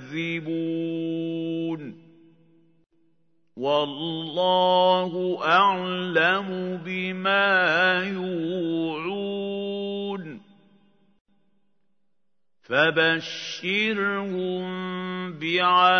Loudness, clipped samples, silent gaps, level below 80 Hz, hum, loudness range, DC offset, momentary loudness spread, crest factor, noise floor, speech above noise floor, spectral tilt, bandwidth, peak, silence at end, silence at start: -24 LUFS; under 0.1%; 11.21-11.25 s; -78 dBFS; none; 10 LU; under 0.1%; 12 LU; 20 dB; -82 dBFS; 59 dB; -5.5 dB/octave; 6.6 kHz; -6 dBFS; 0 s; 0 s